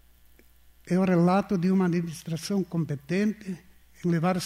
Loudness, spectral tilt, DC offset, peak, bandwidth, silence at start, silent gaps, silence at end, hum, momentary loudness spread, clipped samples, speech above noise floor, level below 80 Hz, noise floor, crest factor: -26 LUFS; -7 dB/octave; under 0.1%; -14 dBFS; 14.5 kHz; 0.85 s; none; 0 s; none; 11 LU; under 0.1%; 31 dB; -60 dBFS; -56 dBFS; 12 dB